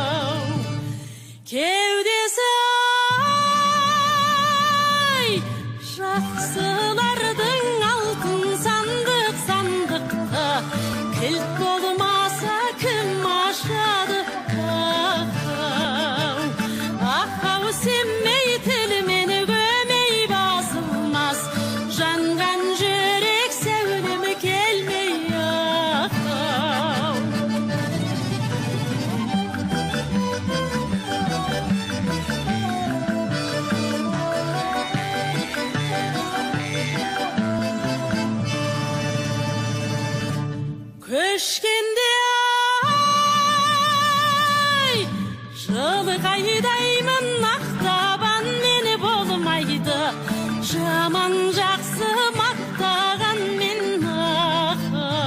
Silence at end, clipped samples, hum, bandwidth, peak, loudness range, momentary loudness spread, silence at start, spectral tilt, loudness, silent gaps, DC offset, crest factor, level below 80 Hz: 0 s; under 0.1%; none; 16 kHz; -6 dBFS; 6 LU; 7 LU; 0 s; -4 dB/octave; -21 LUFS; none; under 0.1%; 16 dB; -54 dBFS